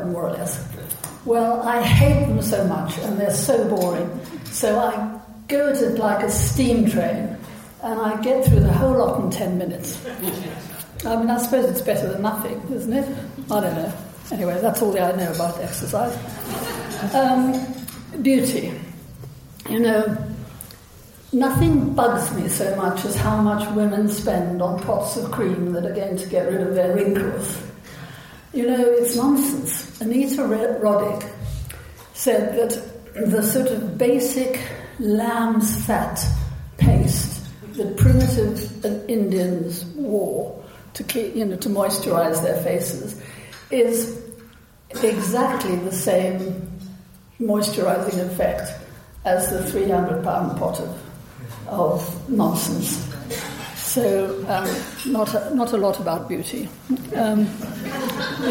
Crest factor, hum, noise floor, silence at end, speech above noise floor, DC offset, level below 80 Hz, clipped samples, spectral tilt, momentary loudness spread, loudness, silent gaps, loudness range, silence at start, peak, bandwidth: 18 dB; none; -47 dBFS; 0 s; 27 dB; under 0.1%; -38 dBFS; under 0.1%; -5.5 dB/octave; 14 LU; -21 LUFS; none; 4 LU; 0 s; -4 dBFS; 17 kHz